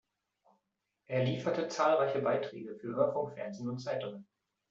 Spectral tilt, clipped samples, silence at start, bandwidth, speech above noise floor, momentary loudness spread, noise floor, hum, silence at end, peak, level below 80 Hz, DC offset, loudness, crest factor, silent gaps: -6 dB/octave; under 0.1%; 1.1 s; 7.8 kHz; 51 dB; 12 LU; -84 dBFS; none; 0.45 s; -16 dBFS; -76 dBFS; under 0.1%; -34 LUFS; 18 dB; none